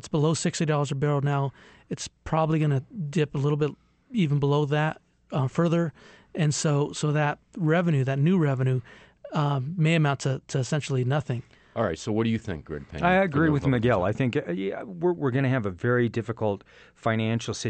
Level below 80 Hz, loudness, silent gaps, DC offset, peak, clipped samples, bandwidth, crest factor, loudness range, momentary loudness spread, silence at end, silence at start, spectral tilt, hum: -54 dBFS; -26 LUFS; none; under 0.1%; -10 dBFS; under 0.1%; 8.8 kHz; 16 dB; 2 LU; 10 LU; 0 s; 0.05 s; -6.5 dB/octave; none